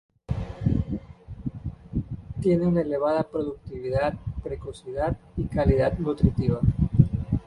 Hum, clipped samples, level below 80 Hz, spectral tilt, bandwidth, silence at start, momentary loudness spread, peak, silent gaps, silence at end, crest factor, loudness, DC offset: none; under 0.1%; -36 dBFS; -9.5 dB/octave; 10.5 kHz; 0.3 s; 13 LU; -4 dBFS; none; 0.05 s; 22 dB; -26 LUFS; under 0.1%